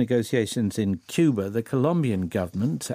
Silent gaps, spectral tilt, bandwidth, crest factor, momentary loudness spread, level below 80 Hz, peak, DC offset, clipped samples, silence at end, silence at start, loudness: none; -6.5 dB/octave; 15.5 kHz; 16 dB; 5 LU; -62 dBFS; -8 dBFS; under 0.1%; under 0.1%; 0 s; 0 s; -25 LUFS